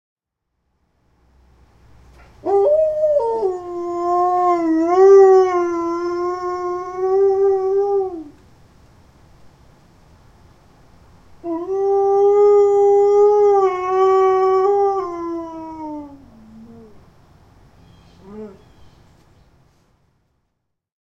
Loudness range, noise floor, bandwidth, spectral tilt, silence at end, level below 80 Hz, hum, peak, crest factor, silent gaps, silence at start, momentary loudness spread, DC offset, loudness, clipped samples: 15 LU; -75 dBFS; 7.2 kHz; -6.5 dB/octave; 2.55 s; -54 dBFS; none; -2 dBFS; 16 dB; none; 2.45 s; 18 LU; under 0.1%; -16 LUFS; under 0.1%